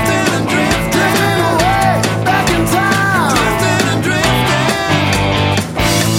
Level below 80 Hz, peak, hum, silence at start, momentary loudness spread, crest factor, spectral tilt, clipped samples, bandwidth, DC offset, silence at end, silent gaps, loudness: -30 dBFS; 0 dBFS; none; 0 s; 2 LU; 12 dB; -4.5 dB/octave; under 0.1%; 16.5 kHz; under 0.1%; 0 s; none; -13 LUFS